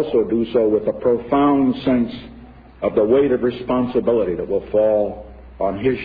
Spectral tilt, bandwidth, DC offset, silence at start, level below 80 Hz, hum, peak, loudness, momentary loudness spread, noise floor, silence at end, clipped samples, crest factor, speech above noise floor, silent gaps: -10.5 dB/octave; 5 kHz; under 0.1%; 0 s; -44 dBFS; none; -4 dBFS; -19 LUFS; 9 LU; -41 dBFS; 0 s; under 0.1%; 14 dB; 23 dB; none